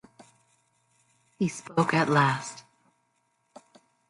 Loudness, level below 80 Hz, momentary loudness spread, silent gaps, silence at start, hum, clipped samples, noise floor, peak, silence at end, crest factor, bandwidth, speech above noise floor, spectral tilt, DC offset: -26 LUFS; -72 dBFS; 15 LU; none; 1.4 s; none; under 0.1%; -73 dBFS; -8 dBFS; 1.5 s; 22 dB; 11.5 kHz; 48 dB; -5.5 dB/octave; under 0.1%